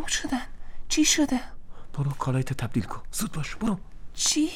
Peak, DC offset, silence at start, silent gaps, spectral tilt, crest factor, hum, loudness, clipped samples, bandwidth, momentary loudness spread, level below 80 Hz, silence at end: -8 dBFS; under 0.1%; 0 s; none; -3.5 dB/octave; 18 dB; none; -27 LUFS; under 0.1%; 17 kHz; 14 LU; -40 dBFS; 0 s